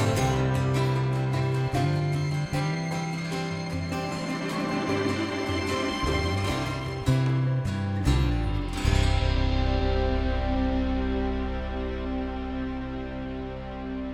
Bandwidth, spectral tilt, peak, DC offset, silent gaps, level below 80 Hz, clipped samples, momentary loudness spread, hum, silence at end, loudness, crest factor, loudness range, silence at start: 15 kHz; -6.5 dB/octave; -10 dBFS; under 0.1%; none; -32 dBFS; under 0.1%; 7 LU; none; 0 s; -28 LUFS; 16 dB; 3 LU; 0 s